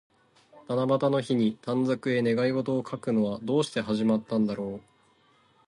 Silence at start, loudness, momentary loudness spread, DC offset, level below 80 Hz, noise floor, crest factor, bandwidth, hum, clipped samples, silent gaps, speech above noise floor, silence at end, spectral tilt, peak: 0.55 s; -27 LUFS; 5 LU; under 0.1%; -66 dBFS; -63 dBFS; 16 dB; 11 kHz; none; under 0.1%; none; 37 dB; 0.9 s; -7 dB/octave; -12 dBFS